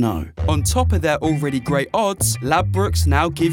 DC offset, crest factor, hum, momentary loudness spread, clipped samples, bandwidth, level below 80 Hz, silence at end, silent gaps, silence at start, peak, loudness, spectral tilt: under 0.1%; 16 dB; none; 4 LU; under 0.1%; 17.5 kHz; -32 dBFS; 0 s; none; 0 s; -2 dBFS; -19 LUFS; -5 dB/octave